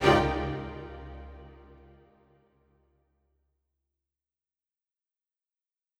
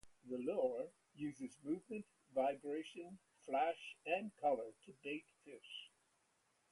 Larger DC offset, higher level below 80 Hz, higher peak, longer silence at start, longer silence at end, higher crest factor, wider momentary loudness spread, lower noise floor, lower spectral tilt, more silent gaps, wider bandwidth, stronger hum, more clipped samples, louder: neither; first, -48 dBFS vs -86 dBFS; first, -6 dBFS vs -26 dBFS; about the same, 0 s vs 0.05 s; first, 4.35 s vs 0.85 s; first, 28 dB vs 20 dB; first, 27 LU vs 14 LU; first, -90 dBFS vs -80 dBFS; about the same, -6 dB/octave vs -5.5 dB/octave; neither; first, 15 kHz vs 11.5 kHz; neither; neither; first, -30 LUFS vs -44 LUFS